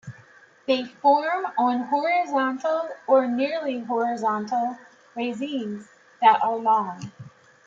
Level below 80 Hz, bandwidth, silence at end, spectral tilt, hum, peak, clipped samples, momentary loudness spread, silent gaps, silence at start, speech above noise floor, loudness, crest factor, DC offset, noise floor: -76 dBFS; 7.6 kHz; 0.4 s; -5.5 dB/octave; none; -6 dBFS; under 0.1%; 15 LU; none; 0.05 s; 30 dB; -23 LUFS; 20 dB; under 0.1%; -53 dBFS